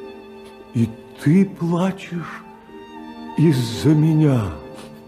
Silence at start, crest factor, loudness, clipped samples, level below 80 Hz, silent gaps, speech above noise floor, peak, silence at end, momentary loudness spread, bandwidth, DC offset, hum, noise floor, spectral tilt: 0 s; 16 dB; -19 LUFS; under 0.1%; -50 dBFS; none; 22 dB; -6 dBFS; 0.05 s; 23 LU; 14 kHz; under 0.1%; none; -40 dBFS; -7.5 dB/octave